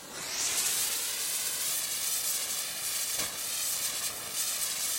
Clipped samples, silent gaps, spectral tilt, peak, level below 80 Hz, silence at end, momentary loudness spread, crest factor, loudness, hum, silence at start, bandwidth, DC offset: under 0.1%; none; 1.5 dB/octave; -16 dBFS; -66 dBFS; 0 s; 4 LU; 16 dB; -29 LUFS; none; 0 s; 17 kHz; under 0.1%